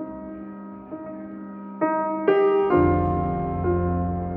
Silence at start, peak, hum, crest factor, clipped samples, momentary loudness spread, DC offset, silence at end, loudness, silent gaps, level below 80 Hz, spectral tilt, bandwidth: 0 s; -6 dBFS; none; 18 dB; under 0.1%; 18 LU; under 0.1%; 0 s; -22 LUFS; none; -40 dBFS; -11.5 dB/octave; 3.4 kHz